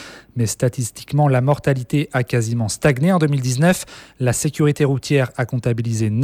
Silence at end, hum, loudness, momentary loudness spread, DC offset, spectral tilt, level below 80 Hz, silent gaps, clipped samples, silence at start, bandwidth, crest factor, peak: 0 s; none; -19 LUFS; 7 LU; under 0.1%; -6 dB/octave; -48 dBFS; none; under 0.1%; 0 s; 16 kHz; 16 dB; -4 dBFS